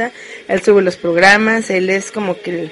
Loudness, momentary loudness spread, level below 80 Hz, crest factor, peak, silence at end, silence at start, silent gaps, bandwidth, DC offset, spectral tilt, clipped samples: -13 LUFS; 13 LU; -52 dBFS; 14 dB; 0 dBFS; 0 s; 0 s; none; 11.5 kHz; under 0.1%; -4.5 dB/octave; under 0.1%